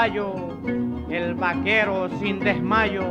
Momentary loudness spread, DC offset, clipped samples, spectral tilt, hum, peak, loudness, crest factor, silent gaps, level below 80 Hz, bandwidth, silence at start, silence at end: 8 LU; under 0.1%; under 0.1%; -7 dB/octave; none; -6 dBFS; -23 LUFS; 16 dB; none; -44 dBFS; 8.2 kHz; 0 s; 0 s